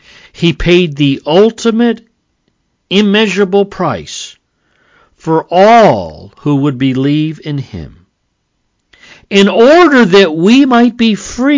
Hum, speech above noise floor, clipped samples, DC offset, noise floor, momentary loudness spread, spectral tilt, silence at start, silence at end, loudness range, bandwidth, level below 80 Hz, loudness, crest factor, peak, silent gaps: none; 55 dB; 0.1%; under 0.1%; -64 dBFS; 15 LU; -6 dB/octave; 0.4 s; 0 s; 6 LU; 7.6 kHz; -38 dBFS; -9 LUFS; 10 dB; 0 dBFS; none